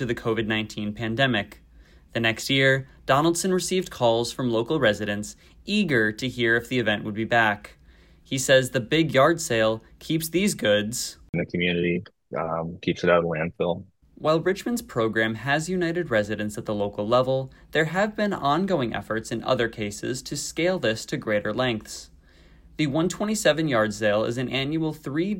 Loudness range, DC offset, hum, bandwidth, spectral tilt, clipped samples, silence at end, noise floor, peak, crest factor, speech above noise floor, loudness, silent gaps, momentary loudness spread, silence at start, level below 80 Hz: 3 LU; under 0.1%; none; 16.5 kHz; -4.5 dB/octave; under 0.1%; 0 s; -53 dBFS; -4 dBFS; 20 dB; 29 dB; -24 LUFS; 11.29-11.33 s; 9 LU; 0 s; -54 dBFS